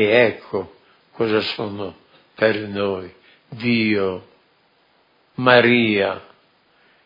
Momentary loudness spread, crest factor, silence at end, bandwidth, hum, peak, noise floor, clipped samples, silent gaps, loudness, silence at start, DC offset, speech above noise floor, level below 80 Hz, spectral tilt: 20 LU; 22 dB; 0.85 s; 5.4 kHz; none; 0 dBFS; -60 dBFS; under 0.1%; none; -19 LUFS; 0 s; under 0.1%; 41 dB; -66 dBFS; -8 dB/octave